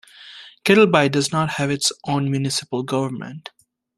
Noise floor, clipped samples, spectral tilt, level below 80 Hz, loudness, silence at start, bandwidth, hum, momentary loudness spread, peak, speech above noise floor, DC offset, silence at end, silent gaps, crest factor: -43 dBFS; under 0.1%; -4.5 dB/octave; -58 dBFS; -19 LUFS; 0.2 s; 14 kHz; none; 22 LU; -2 dBFS; 23 dB; under 0.1%; 0.6 s; none; 20 dB